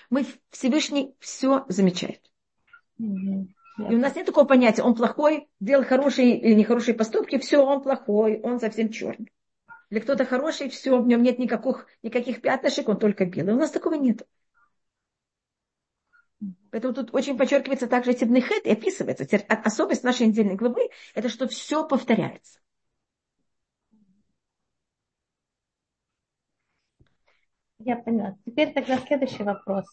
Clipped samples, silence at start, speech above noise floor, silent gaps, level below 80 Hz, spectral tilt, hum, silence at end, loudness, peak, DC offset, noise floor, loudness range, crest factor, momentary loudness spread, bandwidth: under 0.1%; 0.1 s; 63 dB; none; -72 dBFS; -5.5 dB/octave; none; 0.1 s; -23 LUFS; -6 dBFS; under 0.1%; -86 dBFS; 10 LU; 20 dB; 12 LU; 8.6 kHz